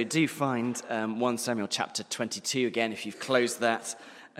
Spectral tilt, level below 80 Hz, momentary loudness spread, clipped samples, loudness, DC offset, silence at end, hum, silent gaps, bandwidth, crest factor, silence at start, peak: -3.5 dB/octave; -80 dBFS; 6 LU; under 0.1%; -29 LUFS; under 0.1%; 0 s; none; none; 16 kHz; 22 dB; 0 s; -8 dBFS